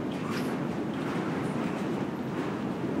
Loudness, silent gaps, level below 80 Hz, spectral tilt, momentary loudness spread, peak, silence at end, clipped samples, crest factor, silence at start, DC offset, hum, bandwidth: -32 LUFS; none; -64 dBFS; -7 dB/octave; 2 LU; -20 dBFS; 0 s; under 0.1%; 12 dB; 0 s; under 0.1%; none; 16 kHz